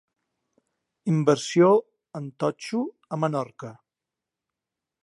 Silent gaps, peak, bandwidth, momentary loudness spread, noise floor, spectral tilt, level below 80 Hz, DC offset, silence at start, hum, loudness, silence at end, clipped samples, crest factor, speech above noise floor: none; -6 dBFS; 11.5 kHz; 19 LU; -88 dBFS; -6.5 dB/octave; -78 dBFS; under 0.1%; 1.05 s; none; -24 LUFS; 1.3 s; under 0.1%; 20 dB; 64 dB